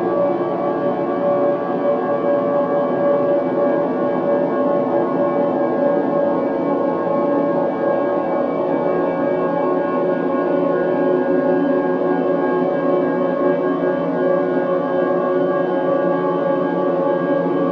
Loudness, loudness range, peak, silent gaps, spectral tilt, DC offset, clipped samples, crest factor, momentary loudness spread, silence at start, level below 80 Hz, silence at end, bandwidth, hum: -18 LUFS; 1 LU; -4 dBFS; none; -9.5 dB/octave; under 0.1%; under 0.1%; 14 dB; 2 LU; 0 s; -62 dBFS; 0 s; 5.4 kHz; none